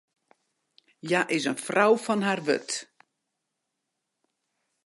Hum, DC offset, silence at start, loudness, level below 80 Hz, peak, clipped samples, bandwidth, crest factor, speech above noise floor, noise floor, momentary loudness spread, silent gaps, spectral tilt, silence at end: none; under 0.1%; 1.05 s; -26 LUFS; -82 dBFS; -8 dBFS; under 0.1%; 11.5 kHz; 22 dB; 57 dB; -82 dBFS; 12 LU; none; -4 dB/octave; 2 s